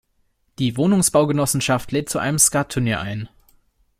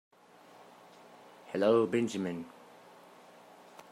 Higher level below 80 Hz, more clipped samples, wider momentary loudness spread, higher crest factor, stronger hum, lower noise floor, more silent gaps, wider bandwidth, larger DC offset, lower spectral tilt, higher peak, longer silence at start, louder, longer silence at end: first, -48 dBFS vs -84 dBFS; neither; second, 10 LU vs 28 LU; about the same, 20 dB vs 20 dB; second, none vs 60 Hz at -55 dBFS; first, -65 dBFS vs -58 dBFS; neither; first, 16.5 kHz vs 14.5 kHz; neither; second, -4 dB/octave vs -6 dB/octave; first, 0 dBFS vs -14 dBFS; second, 0.6 s vs 1.45 s; first, -19 LUFS vs -31 LUFS; second, 0.75 s vs 1.4 s